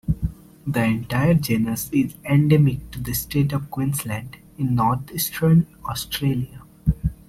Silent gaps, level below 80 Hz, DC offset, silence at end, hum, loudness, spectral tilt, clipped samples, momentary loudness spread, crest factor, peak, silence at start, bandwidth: none; -38 dBFS; under 0.1%; 0.15 s; none; -22 LUFS; -6 dB/octave; under 0.1%; 12 LU; 18 dB; -4 dBFS; 0.05 s; 16.5 kHz